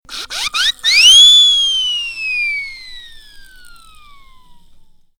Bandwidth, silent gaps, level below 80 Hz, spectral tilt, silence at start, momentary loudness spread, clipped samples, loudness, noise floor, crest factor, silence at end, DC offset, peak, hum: over 20 kHz; none; -44 dBFS; 4 dB/octave; 0.1 s; 20 LU; under 0.1%; -8 LUFS; -43 dBFS; 14 dB; 1.75 s; under 0.1%; 0 dBFS; none